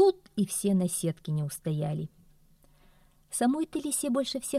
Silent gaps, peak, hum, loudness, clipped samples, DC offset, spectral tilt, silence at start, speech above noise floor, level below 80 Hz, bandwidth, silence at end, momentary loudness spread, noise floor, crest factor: none; -12 dBFS; none; -30 LUFS; under 0.1%; under 0.1%; -5.5 dB/octave; 0 s; 31 dB; -62 dBFS; 15.5 kHz; 0 s; 7 LU; -61 dBFS; 16 dB